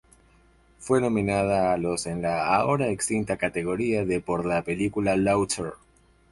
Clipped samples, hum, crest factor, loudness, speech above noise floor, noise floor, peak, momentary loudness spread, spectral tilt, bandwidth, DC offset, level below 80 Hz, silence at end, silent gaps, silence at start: under 0.1%; none; 16 dB; -25 LUFS; 34 dB; -58 dBFS; -8 dBFS; 5 LU; -5.5 dB/octave; 11.5 kHz; under 0.1%; -50 dBFS; 0.55 s; none; 0.8 s